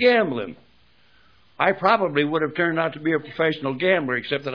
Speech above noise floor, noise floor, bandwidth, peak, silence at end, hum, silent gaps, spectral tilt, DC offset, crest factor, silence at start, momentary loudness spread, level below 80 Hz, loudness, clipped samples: 37 dB; -59 dBFS; 5.4 kHz; -2 dBFS; 0 s; none; none; -7.5 dB/octave; 0.1%; 20 dB; 0 s; 6 LU; -64 dBFS; -22 LUFS; under 0.1%